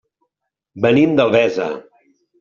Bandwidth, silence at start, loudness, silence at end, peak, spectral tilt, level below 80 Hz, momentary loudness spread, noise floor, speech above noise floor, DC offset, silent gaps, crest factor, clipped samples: 7.2 kHz; 0.75 s; -16 LUFS; 0.6 s; -2 dBFS; -5 dB/octave; -58 dBFS; 12 LU; -78 dBFS; 63 dB; under 0.1%; none; 16 dB; under 0.1%